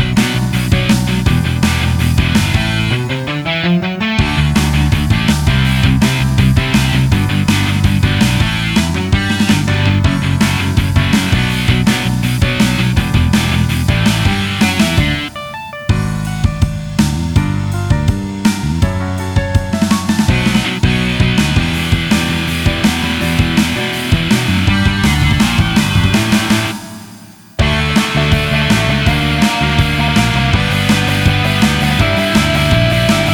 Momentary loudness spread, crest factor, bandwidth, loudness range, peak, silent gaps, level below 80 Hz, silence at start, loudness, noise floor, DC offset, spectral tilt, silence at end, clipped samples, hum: 4 LU; 12 dB; 18.5 kHz; 3 LU; 0 dBFS; none; -24 dBFS; 0 s; -13 LUFS; -36 dBFS; under 0.1%; -5 dB/octave; 0 s; under 0.1%; none